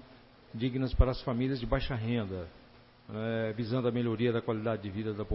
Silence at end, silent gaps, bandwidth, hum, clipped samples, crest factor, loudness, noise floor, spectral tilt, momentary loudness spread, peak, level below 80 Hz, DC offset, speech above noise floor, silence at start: 0 s; none; 5.8 kHz; none; under 0.1%; 22 dB; -33 LUFS; -56 dBFS; -11 dB/octave; 9 LU; -10 dBFS; -40 dBFS; under 0.1%; 25 dB; 0 s